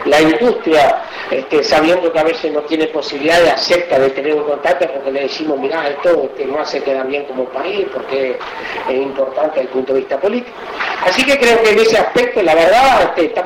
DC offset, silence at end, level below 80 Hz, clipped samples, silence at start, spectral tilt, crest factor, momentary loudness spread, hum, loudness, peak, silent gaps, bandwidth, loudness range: under 0.1%; 0 s; -46 dBFS; under 0.1%; 0 s; -3.5 dB/octave; 12 dB; 10 LU; none; -14 LUFS; -2 dBFS; none; 16.5 kHz; 6 LU